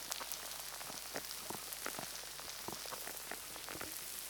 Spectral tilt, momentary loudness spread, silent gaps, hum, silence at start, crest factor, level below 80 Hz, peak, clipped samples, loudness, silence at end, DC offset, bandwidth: -0.5 dB/octave; 3 LU; none; none; 0 s; 32 dB; -70 dBFS; -14 dBFS; under 0.1%; -43 LUFS; 0 s; under 0.1%; over 20 kHz